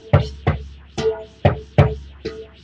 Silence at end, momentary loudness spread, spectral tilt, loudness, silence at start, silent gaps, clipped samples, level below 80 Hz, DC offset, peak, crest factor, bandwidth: 0.15 s; 15 LU; -7.5 dB/octave; -21 LUFS; 0.05 s; none; under 0.1%; -34 dBFS; under 0.1%; 0 dBFS; 20 dB; 7.8 kHz